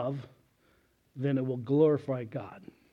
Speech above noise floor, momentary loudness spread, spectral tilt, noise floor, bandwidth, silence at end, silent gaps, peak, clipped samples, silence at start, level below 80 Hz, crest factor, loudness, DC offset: 38 dB; 22 LU; -10 dB/octave; -68 dBFS; 5.6 kHz; 0.35 s; none; -12 dBFS; under 0.1%; 0 s; -74 dBFS; 18 dB; -30 LUFS; under 0.1%